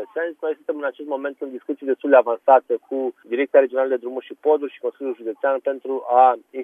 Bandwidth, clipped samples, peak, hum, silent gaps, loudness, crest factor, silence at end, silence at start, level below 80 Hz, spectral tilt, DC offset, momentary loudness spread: 3.7 kHz; under 0.1%; -2 dBFS; none; none; -21 LUFS; 18 dB; 0 s; 0 s; -86 dBFS; -6 dB/octave; under 0.1%; 13 LU